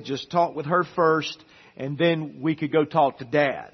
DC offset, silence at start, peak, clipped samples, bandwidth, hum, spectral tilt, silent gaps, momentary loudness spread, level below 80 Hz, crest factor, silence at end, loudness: under 0.1%; 0 s; -6 dBFS; under 0.1%; 6.4 kHz; none; -6.5 dB/octave; none; 11 LU; -68 dBFS; 18 dB; 0.05 s; -24 LUFS